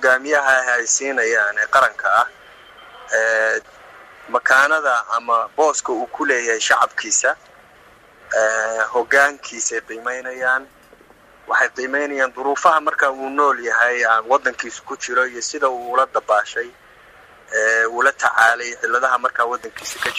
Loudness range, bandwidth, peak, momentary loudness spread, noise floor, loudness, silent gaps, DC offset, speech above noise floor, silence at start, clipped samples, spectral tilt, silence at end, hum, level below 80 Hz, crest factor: 3 LU; 15 kHz; 0 dBFS; 9 LU; -49 dBFS; -18 LUFS; none; under 0.1%; 30 dB; 0 s; under 0.1%; 0 dB/octave; 0 s; none; -62 dBFS; 18 dB